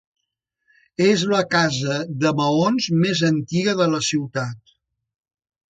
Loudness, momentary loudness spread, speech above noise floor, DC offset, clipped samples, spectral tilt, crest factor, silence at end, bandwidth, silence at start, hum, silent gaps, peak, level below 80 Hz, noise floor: -20 LUFS; 7 LU; 59 dB; under 0.1%; under 0.1%; -5 dB/octave; 16 dB; 1.15 s; 9.4 kHz; 1 s; none; none; -4 dBFS; -60 dBFS; -79 dBFS